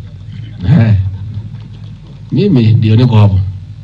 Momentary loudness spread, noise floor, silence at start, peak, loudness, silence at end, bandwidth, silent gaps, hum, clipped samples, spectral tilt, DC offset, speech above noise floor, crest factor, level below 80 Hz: 21 LU; -29 dBFS; 0 s; 0 dBFS; -10 LUFS; 0 s; 5.2 kHz; none; none; under 0.1%; -10 dB/octave; under 0.1%; 22 dB; 12 dB; -36 dBFS